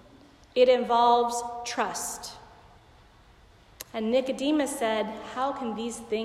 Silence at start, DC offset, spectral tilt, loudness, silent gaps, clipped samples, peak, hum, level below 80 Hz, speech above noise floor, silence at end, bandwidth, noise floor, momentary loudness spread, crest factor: 0.55 s; under 0.1%; -3 dB/octave; -26 LUFS; none; under 0.1%; -10 dBFS; none; -60 dBFS; 29 dB; 0 s; 15.5 kHz; -56 dBFS; 13 LU; 18 dB